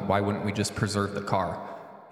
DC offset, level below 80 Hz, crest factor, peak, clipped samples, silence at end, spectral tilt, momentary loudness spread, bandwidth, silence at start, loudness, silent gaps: under 0.1%; -56 dBFS; 20 dB; -8 dBFS; under 0.1%; 0 s; -5.5 dB/octave; 13 LU; 15 kHz; 0 s; -29 LUFS; none